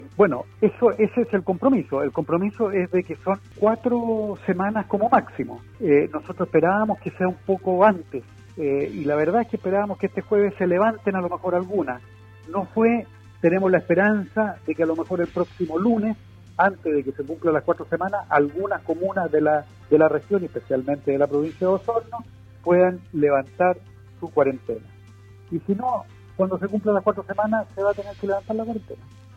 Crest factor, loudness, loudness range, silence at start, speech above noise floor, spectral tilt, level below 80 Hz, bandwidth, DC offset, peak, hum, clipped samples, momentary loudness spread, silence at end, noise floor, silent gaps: 18 dB; -23 LUFS; 3 LU; 0 s; 24 dB; -9 dB/octave; -58 dBFS; 7.6 kHz; under 0.1%; -4 dBFS; none; under 0.1%; 11 LU; 0.3 s; -46 dBFS; none